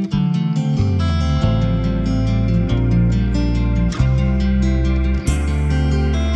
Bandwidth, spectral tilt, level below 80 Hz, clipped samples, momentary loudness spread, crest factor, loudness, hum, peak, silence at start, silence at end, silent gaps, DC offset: 11 kHz; -7.5 dB/octave; -20 dBFS; under 0.1%; 2 LU; 12 dB; -18 LUFS; none; -4 dBFS; 0 s; 0 s; none; under 0.1%